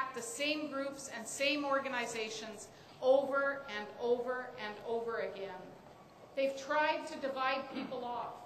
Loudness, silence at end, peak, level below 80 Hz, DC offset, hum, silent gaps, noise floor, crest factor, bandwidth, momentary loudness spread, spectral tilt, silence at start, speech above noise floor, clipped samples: -36 LUFS; 0 s; -18 dBFS; -76 dBFS; under 0.1%; none; none; -56 dBFS; 18 dB; 15 kHz; 13 LU; -2.5 dB/octave; 0 s; 20 dB; under 0.1%